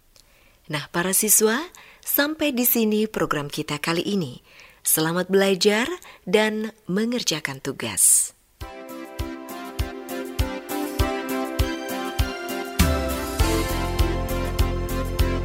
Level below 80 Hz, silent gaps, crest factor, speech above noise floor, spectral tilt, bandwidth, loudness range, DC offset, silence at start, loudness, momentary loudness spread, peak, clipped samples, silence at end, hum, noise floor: -32 dBFS; none; 20 dB; 33 dB; -3.5 dB/octave; 16.5 kHz; 7 LU; under 0.1%; 0.7 s; -22 LUFS; 15 LU; -2 dBFS; under 0.1%; 0 s; none; -55 dBFS